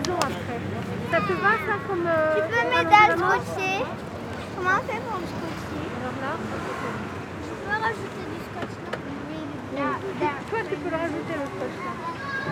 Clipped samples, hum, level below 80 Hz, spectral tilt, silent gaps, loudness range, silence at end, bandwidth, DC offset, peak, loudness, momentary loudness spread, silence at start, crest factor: under 0.1%; none; -54 dBFS; -5 dB/octave; none; 9 LU; 0 s; 19.5 kHz; under 0.1%; -2 dBFS; -26 LUFS; 12 LU; 0 s; 24 dB